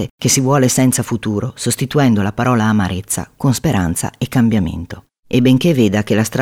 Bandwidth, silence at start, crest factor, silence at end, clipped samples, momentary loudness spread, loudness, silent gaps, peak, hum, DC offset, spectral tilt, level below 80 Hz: 17 kHz; 0 s; 14 dB; 0 s; under 0.1%; 8 LU; -15 LUFS; 0.10-0.18 s; -2 dBFS; none; under 0.1%; -5 dB/octave; -42 dBFS